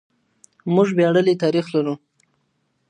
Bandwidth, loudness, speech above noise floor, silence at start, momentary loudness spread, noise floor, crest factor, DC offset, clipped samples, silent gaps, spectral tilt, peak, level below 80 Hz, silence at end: 9.6 kHz; -19 LUFS; 51 dB; 0.65 s; 13 LU; -69 dBFS; 18 dB; under 0.1%; under 0.1%; none; -7.5 dB/octave; -4 dBFS; -72 dBFS; 0.95 s